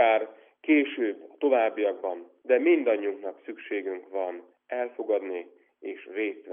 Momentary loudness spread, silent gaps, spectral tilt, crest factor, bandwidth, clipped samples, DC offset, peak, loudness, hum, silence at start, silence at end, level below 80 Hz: 16 LU; none; -1 dB/octave; 18 dB; 3.7 kHz; under 0.1%; under 0.1%; -10 dBFS; -28 LUFS; none; 0 s; 0 s; under -90 dBFS